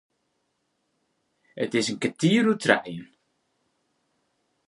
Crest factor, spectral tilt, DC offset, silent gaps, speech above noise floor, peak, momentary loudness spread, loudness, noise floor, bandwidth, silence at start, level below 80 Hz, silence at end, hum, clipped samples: 26 dB; -5 dB/octave; under 0.1%; none; 51 dB; -2 dBFS; 14 LU; -24 LUFS; -75 dBFS; 11.5 kHz; 1.55 s; -72 dBFS; 1.65 s; none; under 0.1%